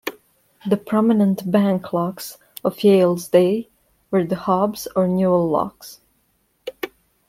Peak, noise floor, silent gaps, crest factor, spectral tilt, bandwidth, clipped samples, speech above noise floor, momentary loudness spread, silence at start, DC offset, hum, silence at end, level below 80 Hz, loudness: -2 dBFS; -65 dBFS; none; 18 dB; -7 dB/octave; 16 kHz; under 0.1%; 47 dB; 17 LU; 0.05 s; under 0.1%; none; 0.4 s; -60 dBFS; -19 LUFS